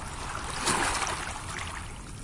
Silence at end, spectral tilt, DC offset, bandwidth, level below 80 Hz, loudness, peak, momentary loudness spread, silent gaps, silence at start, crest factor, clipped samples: 0 s; -2 dB/octave; under 0.1%; 11.5 kHz; -44 dBFS; -31 LUFS; -12 dBFS; 11 LU; none; 0 s; 20 dB; under 0.1%